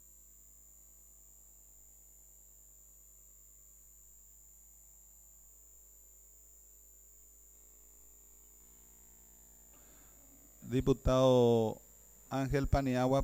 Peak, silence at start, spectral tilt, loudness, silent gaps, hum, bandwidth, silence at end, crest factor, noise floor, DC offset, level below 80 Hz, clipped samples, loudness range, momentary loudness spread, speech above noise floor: -16 dBFS; 10.65 s; -6.5 dB/octave; -31 LUFS; none; none; 19 kHz; 0 s; 22 dB; -60 dBFS; under 0.1%; -50 dBFS; under 0.1%; 24 LU; 26 LU; 30 dB